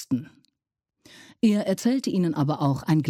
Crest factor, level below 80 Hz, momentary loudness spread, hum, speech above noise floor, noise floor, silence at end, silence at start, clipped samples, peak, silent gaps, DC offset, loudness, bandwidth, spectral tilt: 16 dB; -64 dBFS; 4 LU; none; 61 dB; -84 dBFS; 0 s; 0 s; under 0.1%; -10 dBFS; none; under 0.1%; -24 LUFS; 15.5 kHz; -7 dB/octave